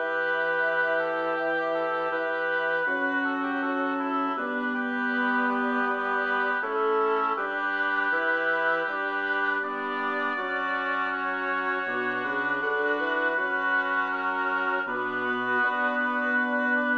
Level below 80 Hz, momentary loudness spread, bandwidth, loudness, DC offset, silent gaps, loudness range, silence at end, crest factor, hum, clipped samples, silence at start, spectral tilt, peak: -76 dBFS; 3 LU; 7 kHz; -26 LUFS; under 0.1%; none; 2 LU; 0 s; 12 dB; none; under 0.1%; 0 s; -5 dB/octave; -14 dBFS